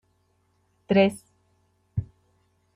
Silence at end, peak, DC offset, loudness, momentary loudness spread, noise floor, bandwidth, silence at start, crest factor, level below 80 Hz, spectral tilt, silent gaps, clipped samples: 0.7 s; -6 dBFS; under 0.1%; -25 LUFS; 24 LU; -68 dBFS; 14 kHz; 0.9 s; 22 dB; -56 dBFS; -7 dB/octave; none; under 0.1%